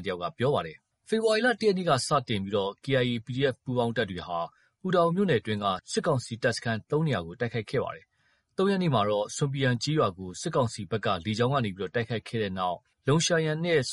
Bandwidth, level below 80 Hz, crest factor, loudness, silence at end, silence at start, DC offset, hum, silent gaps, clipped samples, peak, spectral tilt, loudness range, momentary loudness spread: 11.5 kHz; -62 dBFS; 18 dB; -28 LUFS; 0 s; 0 s; under 0.1%; none; none; under 0.1%; -10 dBFS; -5 dB/octave; 2 LU; 8 LU